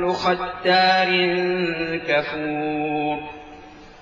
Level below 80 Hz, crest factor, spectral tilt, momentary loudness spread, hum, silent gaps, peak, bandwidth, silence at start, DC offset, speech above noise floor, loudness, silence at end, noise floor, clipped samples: -54 dBFS; 16 dB; -5.5 dB/octave; 10 LU; none; none; -6 dBFS; 7.4 kHz; 0 s; under 0.1%; 21 dB; -21 LUFS; 0 s; -42 dBFS; under 0.1%